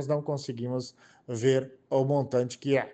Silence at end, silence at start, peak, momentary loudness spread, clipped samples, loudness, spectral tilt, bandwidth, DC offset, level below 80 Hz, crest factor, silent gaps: 0 s; 0 s; -12 dBFS; 9 LU; under 0.1%; -29 LUFS; -6.5 dB/octave; 8.8 kHz; under 0.1%; -72 dBFS; 16 dB; none